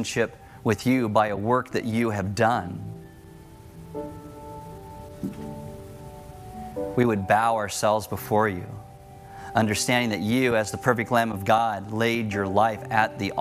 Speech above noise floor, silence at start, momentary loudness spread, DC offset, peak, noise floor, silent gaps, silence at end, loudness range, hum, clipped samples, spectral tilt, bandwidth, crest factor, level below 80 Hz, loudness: 22 dB; 0 s; 19 LU; under 0.1%; -4 dBFS; -46 dBFS; none; 0 s; 15 LU; none; under 0.1%; -5 dB/octave; 16 kHz; 20 dB; -54 dBFS; -24 LUFS